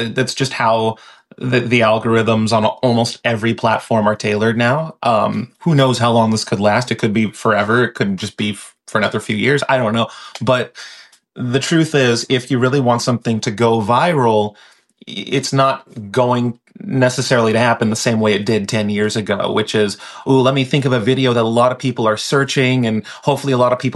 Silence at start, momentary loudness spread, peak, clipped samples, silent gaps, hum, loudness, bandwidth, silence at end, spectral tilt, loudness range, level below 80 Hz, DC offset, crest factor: 0 s; 7 LU; -2 dBFS; under 0.1%; none; none; -16 LUFS; 12.5 kHz; 0 s; -5.5 dB/octave; 2 LU; -58 dBFS; under 0.1%; 14 dB